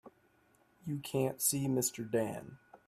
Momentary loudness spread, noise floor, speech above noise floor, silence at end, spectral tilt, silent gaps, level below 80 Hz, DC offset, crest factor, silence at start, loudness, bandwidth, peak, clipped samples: 16 LU; -70 dBFS; 35 dB; 0.1 s; -4.5 dB/octave; none; -72 dBFS; under 0.1%; 20 dB; 0.05 s; -34 LUFS; 16 kHz; -16 dBFS; under 0.1%